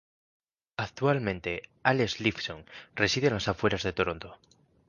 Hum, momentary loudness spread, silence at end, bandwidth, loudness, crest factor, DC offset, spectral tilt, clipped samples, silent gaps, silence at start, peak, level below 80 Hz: none; 15 LU; 0.55 s; 10 kHz; -29 LUFS; 24 dB; under 0.1%; -5 dB/octave; under 0.1%; none; 0.8 s; -6 dBFS; -54 dBFS